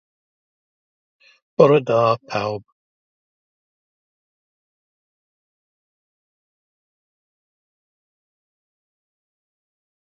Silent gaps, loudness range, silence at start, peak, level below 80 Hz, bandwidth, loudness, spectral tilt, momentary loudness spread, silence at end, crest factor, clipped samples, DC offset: none; 12 LU; 1.6 s; 0 dBFS; -68 dBFS; 7 kHz; -18 LUFS; -7 dB/octave; 15 LU; 7.5 s; 26 dB; under 0.1%; under 0.1%